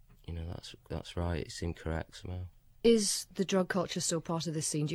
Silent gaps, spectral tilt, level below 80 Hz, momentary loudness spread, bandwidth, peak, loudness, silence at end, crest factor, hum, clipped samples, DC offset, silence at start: none; -4.5 dB/octave; -50 dBFS; 16 LU; 16 kHz; -14 dBFS; -33 LUFS; 0 s; 20 dB; none; under 0.1%; under 0.1%; 0.3 s